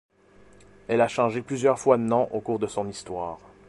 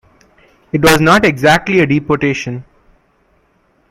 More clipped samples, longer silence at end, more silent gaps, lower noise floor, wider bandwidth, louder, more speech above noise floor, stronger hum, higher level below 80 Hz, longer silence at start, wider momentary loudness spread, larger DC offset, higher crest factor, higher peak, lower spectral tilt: neither; second, 0.3 s vs 1.3 s; neither; about the same, -55 dBFS vs -56 dBFS; second, 11.5 kHz vs 17 kHz; second, -25 LUFS vs -12 LUFS; second, 30 dB vs 45 dB; neither; second, -60 dBFS vs -40 dBFS; first, 0.9 s vs 0.75 s; about the same, 12 LU vs 13 LU; neither; first, 22 dB vs 14 dB; second, -4 dBFS vs 0 dBFS; about the same, -6 dB/octave vs -5 dB/octave